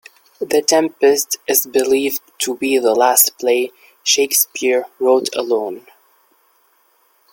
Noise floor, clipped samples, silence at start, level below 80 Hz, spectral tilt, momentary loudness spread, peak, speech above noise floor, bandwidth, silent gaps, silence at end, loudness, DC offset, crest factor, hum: -58 dBFS; under 0.1%; 0.4 s; -66 dBFS; -1 dB/octave; 9 LU; 0 dBFS; 42 dB; 17 kHz; none; 1.55 s; -16 LUFS; under 0.1%; 18 dB; none